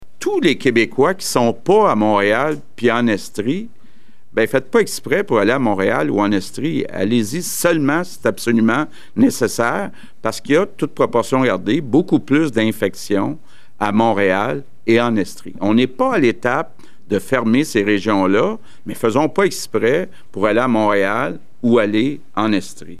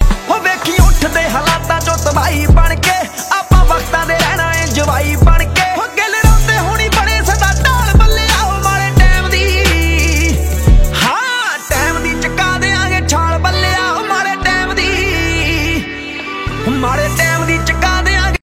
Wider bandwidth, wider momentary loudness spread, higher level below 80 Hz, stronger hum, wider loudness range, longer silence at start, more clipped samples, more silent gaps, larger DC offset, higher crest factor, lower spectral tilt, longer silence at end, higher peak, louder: about the same, 15 kHz vs 16.5 kHz; first, 8 LU vs 4 LU; second, -58 dBFS vs -14 dBFS; neither; about the same, 1 LU vs 3 LU; about the same, 0 s vs 0 s; neither; neither; first, 3% vs under 0.1%; about the same, 16 dB vs 12 dB; about the same, -5 dB/octave vs -4 dB/octave; about the same, 0.05 s vs 0.05 s; about the same, 0 dBFS vs 0 dBFS; second, -17 LUFS vs -12 LUFS